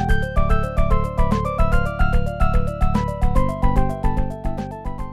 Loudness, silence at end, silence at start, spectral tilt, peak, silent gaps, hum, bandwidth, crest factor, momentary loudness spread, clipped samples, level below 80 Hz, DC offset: -22 LUFS; 0 s; 0 s; -8 dB/octave; -4 dBFS; none; none; 12 kHz; 14 dB; 7 LU; under 0.1%; -22 dBFS; under 0.1%